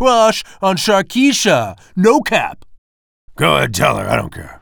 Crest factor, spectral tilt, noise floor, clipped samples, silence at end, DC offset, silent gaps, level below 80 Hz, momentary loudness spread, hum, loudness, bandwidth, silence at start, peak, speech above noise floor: 14 dB; -4 dB/octave; under -90 dBFS; under 0.1%; 0.05 s; under 0.1%; 2.78-3.28 s; -42 dBFS; 7 LU; none; -14 LUFS; over 20 kHz; 0 s; 0 dBFS; over 76 dB